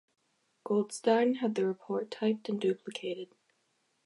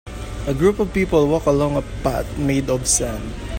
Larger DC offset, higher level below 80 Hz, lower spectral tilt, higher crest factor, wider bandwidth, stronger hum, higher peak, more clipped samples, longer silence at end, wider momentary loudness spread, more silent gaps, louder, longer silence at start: neither; second, -88 dBFS vs -32 dBFS; about the same, -5.5 dB/octave vs -5 dB/octave; about the same, 20 dB vs 16 dB; second, 11.5 kHz vs 16.5 kHz; neither; second, -14 dBFS vs -2 dBFS; neither; first, 0.8 s vs 0 s; first, 12 LU vs 9 LU; neither; second, -32 LUFS vs -20 LUFS; first, 0.65 s vs 0.05 s